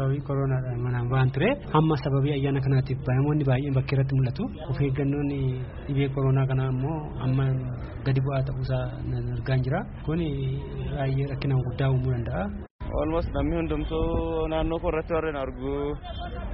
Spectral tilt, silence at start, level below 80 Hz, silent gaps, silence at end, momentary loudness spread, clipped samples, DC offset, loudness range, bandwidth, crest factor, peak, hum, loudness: -7.5 dB/octave; 0 s; -38 dBFS; 12.70-12.79 s; 0 s; 8 LU; under 0.1%; under 0.1%; 4 LU; 5.6 kHz; 18 dB; -8 dBFS; none; -27 LUFS